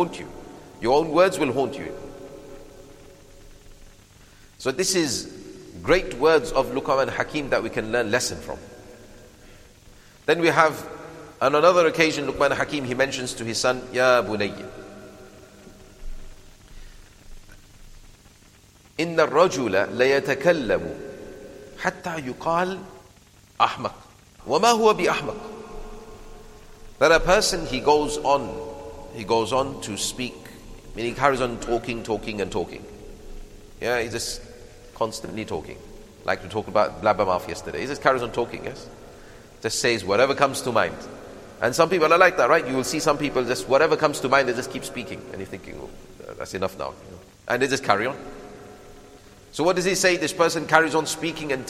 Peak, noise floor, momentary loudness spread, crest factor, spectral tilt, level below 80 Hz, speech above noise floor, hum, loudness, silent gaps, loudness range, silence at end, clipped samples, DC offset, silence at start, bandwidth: 0 dBFS; -53 dBFS; 22 LU; 24 dB; -3.5 dB/octave; -46 dBFS; 30 dB; none; -22 LUFS; none; 8 LU; 0 s; under 0.1%; under 0.1%; 0 s; 15.5 kHz